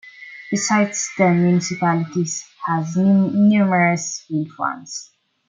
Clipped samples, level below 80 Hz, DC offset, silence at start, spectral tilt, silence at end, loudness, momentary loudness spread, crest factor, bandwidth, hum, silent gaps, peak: under 0.1%; -64 dBFS; under 0.1%; 0.05 s; -5.5 dB/octave; 0.45 s; -19 LUFS; 12 LU; 16 dB; 9.4 kHz; none; none; -4 dBFS